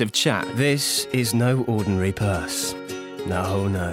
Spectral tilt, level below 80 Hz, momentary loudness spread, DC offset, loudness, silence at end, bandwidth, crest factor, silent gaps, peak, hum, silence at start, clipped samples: -4.5 dB/octave; -48 dBFS; 7 LU; under 0.1%; -23 LUFS; 0 s; 16.5 kHz; 18 dB; none; -6 dBFS; none; 0 s; under 0.1%